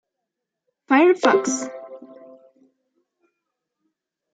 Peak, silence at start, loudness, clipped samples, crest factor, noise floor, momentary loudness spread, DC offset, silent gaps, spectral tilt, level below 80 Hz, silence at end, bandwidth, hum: -2 dBFS; 0.9 s; -18 LUFS; under 0.1%; 22 dB; -82 dBFS; 22 LU; under 0.1%; none; -3 dB/octave; -80 dBFS; 2.35 s; 9.2 kHz; none